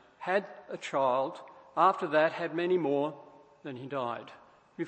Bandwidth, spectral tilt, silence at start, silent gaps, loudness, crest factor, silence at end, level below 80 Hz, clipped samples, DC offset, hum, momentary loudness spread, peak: 8.8 kHz; -6 dB/octave; 0.2 s; none; -30 LUFS; 20 dB; 0 s; -82 dBFS; under 0.1%; under 0.1%; none; 18 LU; -12 dBFS